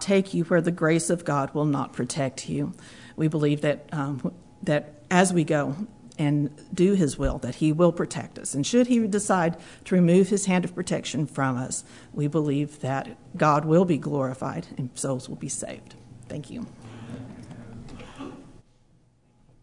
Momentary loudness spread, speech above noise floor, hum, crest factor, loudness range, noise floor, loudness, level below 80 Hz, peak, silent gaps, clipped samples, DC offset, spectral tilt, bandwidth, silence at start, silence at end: 19 LU; 36 dB; none; 20 dB; 12 LU; -61 dBFS; -25 LUFS; -48 dBFS; -6 dBFS; none; under 0.1%; 0.1%; -6 dB/octave; 11 kHz; 0 s; 1.05 s